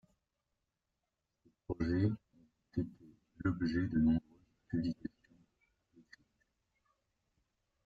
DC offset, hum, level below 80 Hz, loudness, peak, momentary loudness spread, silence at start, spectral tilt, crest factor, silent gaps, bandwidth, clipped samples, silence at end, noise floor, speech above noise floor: under 0.1%; none; -60 dBFS; -37 LUFS; -22 dBFS; 14 LU; 1.7 s; -9 dB/octave; 20 dB; none; 6.6 kHz; under 0.1%; 2.8 s; -88 dBFS; 54 dB